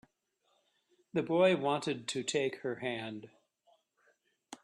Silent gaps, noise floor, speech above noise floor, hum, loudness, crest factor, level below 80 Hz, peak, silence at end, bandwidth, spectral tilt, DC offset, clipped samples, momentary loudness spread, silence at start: none; -78 dBFS; 45 dB; none; -33 LUFS; 20 dB; -78 dBFS; -16 dBFS; 0.1 s; 12 kHz; -4.5 dB/octave; under 0.1%; under 0.1%; 15 LU; 1.15 s